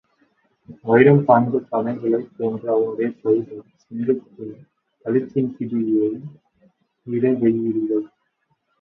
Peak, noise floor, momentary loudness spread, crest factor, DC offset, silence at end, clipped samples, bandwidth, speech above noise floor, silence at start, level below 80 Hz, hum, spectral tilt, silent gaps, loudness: 0 dBFS; -69 dBFS; 21 LU; 20 dB; under 0.1%; 0.75 s; under 0.1%; 4 kHz; 50 dB; 0.7 s; -64 dBFS; none; -11 dB/octave; none; -20 LUFS